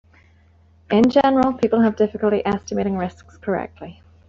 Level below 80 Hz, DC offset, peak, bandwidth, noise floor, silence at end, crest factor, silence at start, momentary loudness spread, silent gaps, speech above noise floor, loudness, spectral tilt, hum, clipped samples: -52 dBFS; under 0.1%; -4 dBFS; 7.4 kHz; -53 dBFS; 0.35 s; 16 dB; 0.9 s; 16 LU; none; 34 dB; -19 LUFS; -7 dB/octave; none; under 0.1%